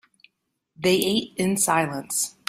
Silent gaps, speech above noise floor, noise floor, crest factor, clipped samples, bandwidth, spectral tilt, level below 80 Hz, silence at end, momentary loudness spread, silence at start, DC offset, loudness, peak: none; 51 dB; -74 dBFS; 20 dB; under 0.1%; 16 kHz; -3 dB/octave; -62 dBFS; 0.2 s; 5 LU; 0.8 s; under 0.1%; -23 LUFS; -4 dBFS